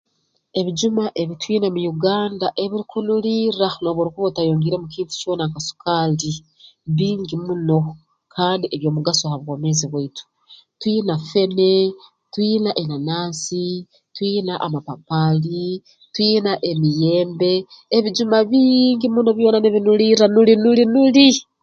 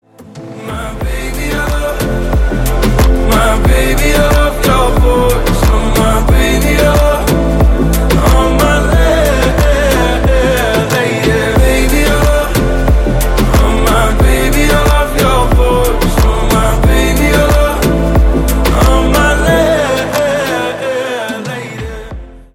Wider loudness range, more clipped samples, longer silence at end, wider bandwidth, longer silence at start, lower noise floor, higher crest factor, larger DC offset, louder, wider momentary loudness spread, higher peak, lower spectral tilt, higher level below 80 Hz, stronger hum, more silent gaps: first, 7 LU vs 2 LU; neither; about the same, 0.2 s vs 0.15 s; second, 9 kHz vs 17 kHz; first, 0.55 s vs 0.2 s; first, -68 dBFS vs -30 dBFS; first, 18 dB vs 10 dB; neither; second, -18 LUFS vs -11 LUFS; first, 12 LU vs 8 LU; about the same, 0 dBFS vs 0 dBFS; about the same, -5.5 dB/octave vs -5.5 dB/octave; second, -60 dBFS vs -14 dBFS; neither; neither